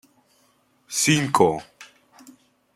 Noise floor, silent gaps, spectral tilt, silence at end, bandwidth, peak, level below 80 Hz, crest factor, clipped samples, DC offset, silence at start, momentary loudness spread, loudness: -63 dBFS; none; -3.5 dB/octave; 0.9 s; 16 kHz; -2 dBFS; -62 dBFS; 22 dB; under 0.1%; under 0.1%; 0.9 s; 11 LU; -21 LUFS